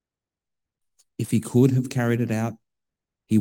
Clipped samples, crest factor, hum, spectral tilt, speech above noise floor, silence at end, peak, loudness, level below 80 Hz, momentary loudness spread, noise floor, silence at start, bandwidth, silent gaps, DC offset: under 0.1%; 20 dB; none; -7.5 dB/octave; 67 dB; 0 s; -6 dBFS; -23 LUFS; -64 dBFS; 12 LU; -89 dBFS; 1.2 s; 18.5 kHz; none; under 0.1%